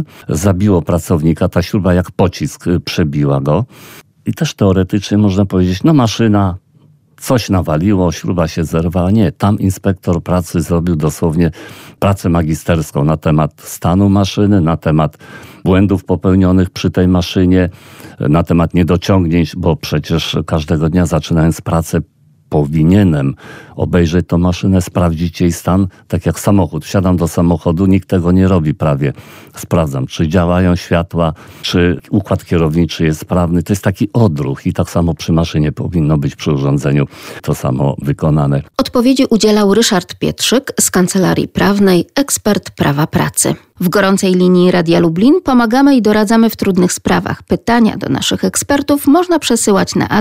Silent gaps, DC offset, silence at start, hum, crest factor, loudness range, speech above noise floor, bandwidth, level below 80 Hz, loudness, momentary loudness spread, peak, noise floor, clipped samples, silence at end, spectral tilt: none; under 0.1%; 0 s; none; 12 dB; 4 LU; 36 dB; 16 kHz; -34 dBFS; -13 LUFS; 7 LU; 0 dBFS; -48 dBFS; under 0.1%; 0 s; -6 dB/octave